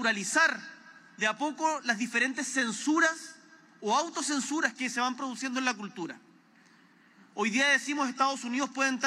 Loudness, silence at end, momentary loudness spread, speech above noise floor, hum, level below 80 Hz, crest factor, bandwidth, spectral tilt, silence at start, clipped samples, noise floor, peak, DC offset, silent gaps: -29 LUFS; 0 s; 15 LU; 31 dB; none; under -90 dBFS; 20 dB; 14 kHz; -2 dB/octave; 0 s; under 0.1%; -60 dBFS; -10 dBFS; under 0.1%; none